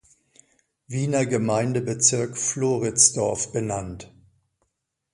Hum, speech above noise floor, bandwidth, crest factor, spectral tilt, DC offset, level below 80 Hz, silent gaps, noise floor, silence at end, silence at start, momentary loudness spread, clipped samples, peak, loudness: none; 54 dB; 11.5 kHz; 22 dB; -4 dB/octave; under 0.1%; -54 dBFS; none; -77 dBFS; 1.1 s; 0.9 s; 14 LU; under 0.1%; -2 dBFS; -22 LUFS